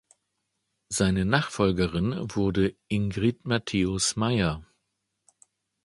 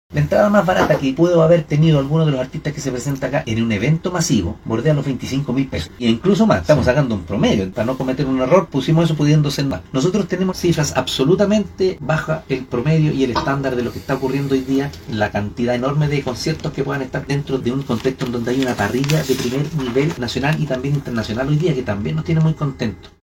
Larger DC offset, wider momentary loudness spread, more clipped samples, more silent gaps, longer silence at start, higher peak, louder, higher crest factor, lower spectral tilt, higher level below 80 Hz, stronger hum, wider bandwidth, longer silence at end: neither; second, 5 LU vs 8 LU; neither; neither; first, 0.9 s vs 0.1 s; second, -4 dBFS vs 0 dBFS; second, -26 LUFS vs -18 LUFS; about the same, 22 dB vs 18 dB; second, -5 dB/octave vs -6.5 dB/octave; second, -46 dBFS vs -40 dBFS; neither; second, 11.5 kHz vs 16.5 kHz; first, 1.2 s vs 0.15 s